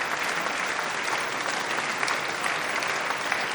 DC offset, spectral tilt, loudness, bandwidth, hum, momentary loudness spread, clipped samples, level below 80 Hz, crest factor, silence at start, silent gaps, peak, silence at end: under 0.1%; -1 dB/octave; -27 LUFS; 17.5 kHz; none; 1 LU; under 0.1%; -68 dBFS; 20 dB; 0 s; none; -8 dBFS; 0 s